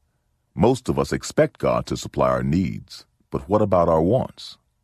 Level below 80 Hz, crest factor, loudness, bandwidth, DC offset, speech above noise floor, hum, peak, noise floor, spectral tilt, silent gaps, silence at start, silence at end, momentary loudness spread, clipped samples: -40 dBFS; 18 dB; -21 LUFS; 14 kHz; under 0.1%; 48 dB; none; -4 dBFS; -69 dBFS; -6.5 dB/octave; none; 0.55 s; 0.3 s; 19 LU; under 0.1%